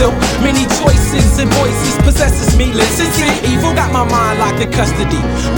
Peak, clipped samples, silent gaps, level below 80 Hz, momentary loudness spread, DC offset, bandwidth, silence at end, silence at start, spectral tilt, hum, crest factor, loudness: 0 dBFS; under 0.1%; none; -18 dBFS; 3 LU; under 0.1%; 19 kHz; 0 s; 0 s; -4.5 dB/octave; none; 12 dB; -12 LUFS